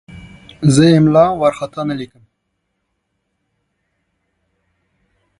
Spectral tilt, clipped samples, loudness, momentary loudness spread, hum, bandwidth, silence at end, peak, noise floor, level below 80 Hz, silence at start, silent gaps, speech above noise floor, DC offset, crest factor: -6.5 dB/octave; under 0.1%; -13 LUFS; 14 LU; none; 11.5 kHz; 3.35 s; 0 dBFS; -71 dBFS; -48 dBFS; 0.15 s; none; 58 dB; under 0.1%; 18 dB